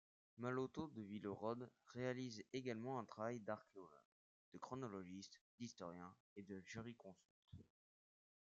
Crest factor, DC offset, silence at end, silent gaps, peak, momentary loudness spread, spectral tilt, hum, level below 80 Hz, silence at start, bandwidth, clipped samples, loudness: 20 dB; under 0.1%; 0.95 s; 4.05-4.52 s, 5.41-5.58 s, 6.20-6.36 s, 7.25-7.42 s; -32 dBFS; 16 LU; -5.5 dB/octave; none; -86 dBFS; 0.35 s; 7.6 kHz; under 0.1%; -51 LUFS